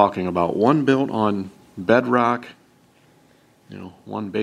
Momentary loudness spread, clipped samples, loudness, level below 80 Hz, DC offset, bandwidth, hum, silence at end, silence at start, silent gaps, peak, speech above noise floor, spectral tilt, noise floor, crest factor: 19 LU; under 0.1%; -20 LUFS; -60 dBFS; under 0.1%; 10.5 kHz; none; 0 s; 0 s; none; -2 dBFS; 36 dB; -7.5 dB/octave; -56 dBFS; 20 dB